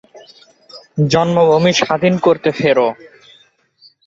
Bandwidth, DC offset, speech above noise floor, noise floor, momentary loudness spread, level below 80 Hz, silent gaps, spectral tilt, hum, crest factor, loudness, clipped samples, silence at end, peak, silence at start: 7.8 kHz; under 0.1%; 39 dB; -52 dBFS; 8 LU; -54 dBFS; none; -5.5 dB/octave; none; 14 dB; -14 LUFS; under 0.1%; 1.15 s; -2 dBFS; 0.15 s